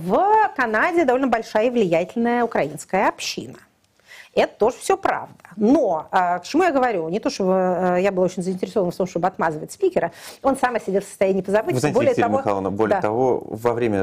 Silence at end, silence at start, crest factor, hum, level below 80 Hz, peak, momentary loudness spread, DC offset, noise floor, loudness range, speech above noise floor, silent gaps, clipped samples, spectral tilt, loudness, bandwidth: 0 s; 0 s; 14 dB; none; -54 dBFS; -6 dBFS; 7 LU; under 0.1%; -51 dBFS; 3 LU; 31 dB; none; under 0.1%; -5.5 dB/octave; -21 LUFS; 15.5 kHz